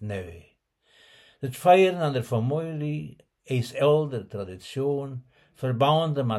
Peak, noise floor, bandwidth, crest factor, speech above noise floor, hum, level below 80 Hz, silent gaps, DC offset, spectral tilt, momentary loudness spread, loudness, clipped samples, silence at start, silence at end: -6 dBFS; -65 dBFS; 15 kHz; 20 dB; 40 dB; none; -64 dBFS; none; under 0.1%; -7 dB/octave; 17 LU; -25 LUFS; under 0.1%; 0 s; 0 s